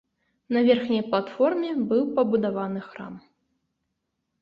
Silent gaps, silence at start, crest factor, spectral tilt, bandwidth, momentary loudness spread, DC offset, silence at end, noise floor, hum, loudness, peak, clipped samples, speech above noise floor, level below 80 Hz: none; 0.5 s; 18 dB; -8.5 dB/octave; 5.6 kHz; 15 LU; under 0.1%; 1.2 s; -79 dBFS; none; -24 LUFS; -6 dBFS; under 0.1%; 55 dB; -68 dBFS